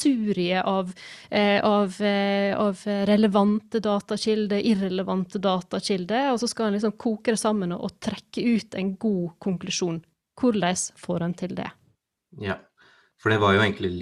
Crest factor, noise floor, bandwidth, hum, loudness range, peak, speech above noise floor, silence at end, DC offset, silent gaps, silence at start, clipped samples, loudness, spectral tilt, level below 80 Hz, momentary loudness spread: 18 dB; -67 dBFS; 12 kHz; none; 5 LU; -8 dBFS; 43 dB; 0 s; under 0.1%; none; 0 s; under 0.1%; -24 LUFS; -5 dB/octave; -62 dBFS; 11 LU